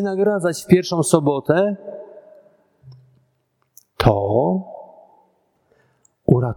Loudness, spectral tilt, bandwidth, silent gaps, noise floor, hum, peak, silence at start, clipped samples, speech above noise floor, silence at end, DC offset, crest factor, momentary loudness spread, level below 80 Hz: -19 LUFS; -6.5 dB/octave; 18.5 kHz; none; -68 dBFS; none; 0 dBFS; 0 s; under 0.1%; 50 dB; 0 s; under 0.1%; 20 dB; 18 LU; -44 dBFS